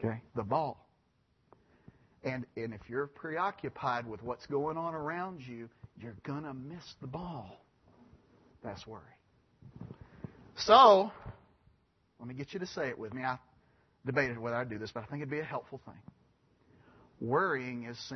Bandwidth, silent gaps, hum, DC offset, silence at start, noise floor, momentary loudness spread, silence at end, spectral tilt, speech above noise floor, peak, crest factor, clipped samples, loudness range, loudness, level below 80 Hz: 6.2 kHz; none; none; under 0.1%; 0 s; -73 dBFS; 20 LU; 0 s; -3.5 dB/octave; 40 dB; -6 dBFS; 28 dB; under 0.1%; 17 LU; -32 LUFS; -68 dBFS